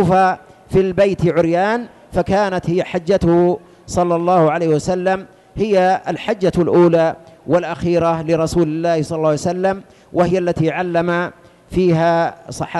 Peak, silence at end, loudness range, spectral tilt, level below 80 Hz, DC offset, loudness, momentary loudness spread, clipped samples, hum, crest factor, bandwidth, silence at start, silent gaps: -4 dBFS; 0 s; 2 LU; -7 dB/octave; -42 dBFS; under 0.1%; -17 LUFS; 9 LU; under 0.1%; none; 12 dB; 12 kHz; 0 s; none